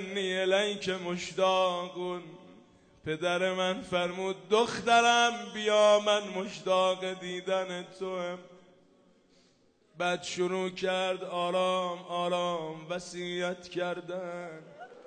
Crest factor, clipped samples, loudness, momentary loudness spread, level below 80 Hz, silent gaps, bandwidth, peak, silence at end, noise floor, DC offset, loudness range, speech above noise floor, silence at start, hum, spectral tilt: 18 dB; under 0.1%; -30 LUFS; 14 LU; -72 dBFS; none; 9.6 kHz; -12 dBFS; 0.05 s; -66 dBFS; under 0.1%; 9 LU; 36 dB; 0 s; none; -3.5 dB/octave